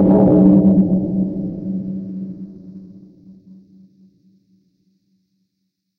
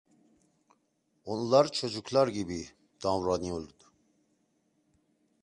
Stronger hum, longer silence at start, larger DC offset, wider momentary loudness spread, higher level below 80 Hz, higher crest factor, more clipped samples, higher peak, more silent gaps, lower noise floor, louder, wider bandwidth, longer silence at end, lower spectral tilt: neither; second, 0 s vs 1.25 s; neither; first, 25 LU vs 18 LU; first, -46 dBFS vs -60 dBFS; second, 16 dB vs 24 dB; neither; first, -2 dBFS vs -10 dBFS; neither; about the same, -74 dBFS vs -75 dBFS; first, -15 LUFS vs -30 LUFS; second, 1.8 kHz vs 11 kHz; first, 3.1 s vs 1.75 s; first, -13.5 dB/octave vs -5 dB/octave